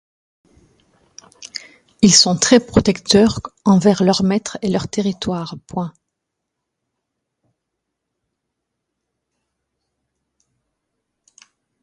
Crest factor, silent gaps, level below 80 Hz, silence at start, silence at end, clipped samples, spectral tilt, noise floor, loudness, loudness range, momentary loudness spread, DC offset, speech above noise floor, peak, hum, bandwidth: 20 dB; none; -46 dBFS; 1.4 s; 5.95 s; under 0.1%; -4 dB/octave; -79 dBFS; -15 LUFS; 16 LU; 18 LU; under 0.1%; 63 dB; 0 dBFS; none; 11.5 kHz